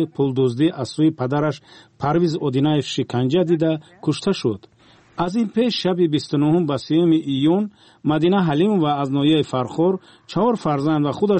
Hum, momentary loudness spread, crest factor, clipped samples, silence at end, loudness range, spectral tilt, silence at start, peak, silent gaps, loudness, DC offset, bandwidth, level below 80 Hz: none; 7 LU; 12 dB; under 0.1%; 0 s; 3 LU; -7 dB/octave; 0 s; -8 dBFS; none; -20 LUFS; under 0.1%; 8.8 kHz; -58 dBFS